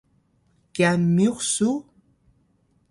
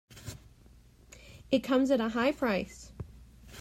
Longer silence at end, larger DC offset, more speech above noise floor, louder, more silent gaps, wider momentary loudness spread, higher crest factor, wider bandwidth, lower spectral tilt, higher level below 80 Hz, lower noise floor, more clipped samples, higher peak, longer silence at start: first, 1.1 s vs 0 s; neither; first, 44 dB vs 29 dB; first, -22 LUFS vs -29 LUFS; neither; second, 10 LU vs 24 LU; about the same, 18 dB vs 20 dB; second, 11.5 kHz vs 16 kHz; about the same, -5 dB/octave vs -5.5 dB/octave; about the same, -60 dBFS vs -56 dBFS; first, -65 dBFS vs -57 dBFS; neither; first, -6 dBFS vs -14 dBFS; first, 0.75 s vs 0.15 s